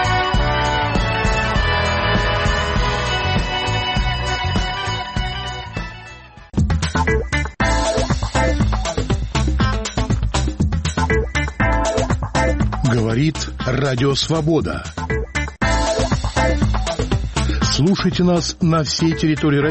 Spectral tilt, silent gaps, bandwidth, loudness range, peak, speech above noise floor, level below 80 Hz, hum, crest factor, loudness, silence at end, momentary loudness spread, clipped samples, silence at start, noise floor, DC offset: -5 dB/octave; none; 8.8 kHz; 3 LU; -6 dBFS; 22 dB; -24 dBFS; none; 12 dB; -19 LUFS; 0 s; 6 LU; under 0.1%; 0 s; -39 dBFS; under 0.1%